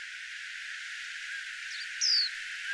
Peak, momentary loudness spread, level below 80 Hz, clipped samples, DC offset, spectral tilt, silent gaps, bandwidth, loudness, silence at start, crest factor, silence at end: -18 dBFS; 14 LU; -80 dBFS; under 0.1%; under 0.1%; 7 dB/octave; none; 11 kHz; -32 LUFS; 0 s; 18 dB; 0 s